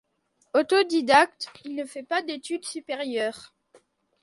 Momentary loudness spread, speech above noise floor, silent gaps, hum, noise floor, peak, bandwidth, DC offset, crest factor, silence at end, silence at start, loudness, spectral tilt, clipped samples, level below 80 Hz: 15 LU; 45 dB; none; none; -70 dBFS; -6 dBFS; 11.5 kHz; under 0.1%; 22 dB; 0.8 s; 0.55 s; -25 LUFS; -2.5 dB/octave; under 0.1%; -72 dBFS